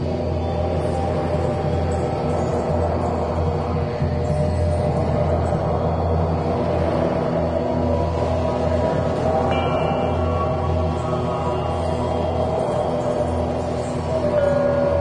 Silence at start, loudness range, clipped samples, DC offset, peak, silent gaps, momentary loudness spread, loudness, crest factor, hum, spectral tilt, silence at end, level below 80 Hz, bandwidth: 0 s; 1 LU; under 0.1%; under 0.1%; -8 dBFS; none; 3 LU; -21 LUFS; 14 dB; none; -8 dB/octave; 0 s; -38 dBFS; 10 kHz